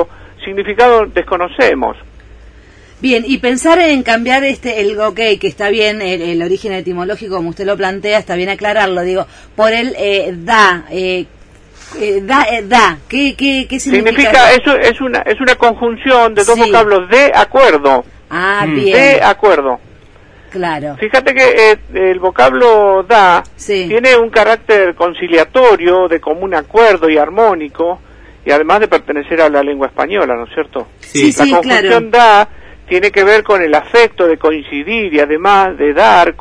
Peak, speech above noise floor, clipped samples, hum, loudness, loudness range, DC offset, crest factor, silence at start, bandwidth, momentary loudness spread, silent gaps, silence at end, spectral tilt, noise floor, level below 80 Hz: 0 dBFS; 29 dB; 0.6%; none; -10 LUFS; 5 LU; under 0.1%; 10 dB; 0 s; 11 kHz; 11 LU; none; 0.1 s; -4 dB/octave; -39 dBFS; -38 dBFS